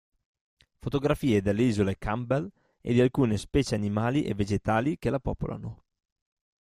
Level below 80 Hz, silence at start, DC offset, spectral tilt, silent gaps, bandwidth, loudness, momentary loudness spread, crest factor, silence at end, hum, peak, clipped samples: -46 dBFS; 0.85 s; under 0.1%; -7 dB/octave; none; 14.5 kHz; -27 LUFS; 11 LU; 18 dB; 0.9 s; none; -10 dBFS; under 0.1%